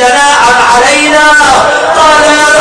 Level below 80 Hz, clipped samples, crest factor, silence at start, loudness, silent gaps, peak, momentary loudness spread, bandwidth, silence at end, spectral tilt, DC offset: -32 dBFS; 8%; 4 dB; 0 s; -4 LUFS; none; 0 dBFS; 2 LU; 11 kHz; 0 s; -1 dB/octave; under 0.1%